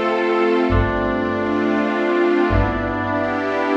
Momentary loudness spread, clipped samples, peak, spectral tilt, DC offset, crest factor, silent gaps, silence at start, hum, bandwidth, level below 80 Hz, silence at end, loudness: 4 LU; under 0.1%; -4 dBFS; -8 dB/octave; under 0.1%; 14 dB; none; 0 s; none; 7.6 kHz; -30 dBFS; 0 s; -19 LUFS